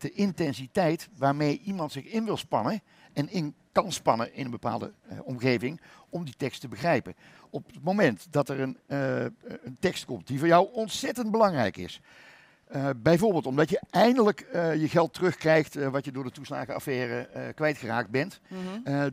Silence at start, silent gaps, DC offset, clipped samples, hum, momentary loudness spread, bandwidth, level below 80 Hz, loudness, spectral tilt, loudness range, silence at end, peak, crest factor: 0 s; none; under 0.1%; under 0.1%; none; 15 LU; 16 kHz; -64 dBFS; -28 LUFS; -6 dB/octave; 6 LU; 0 s; -6 dBFS; 22 dB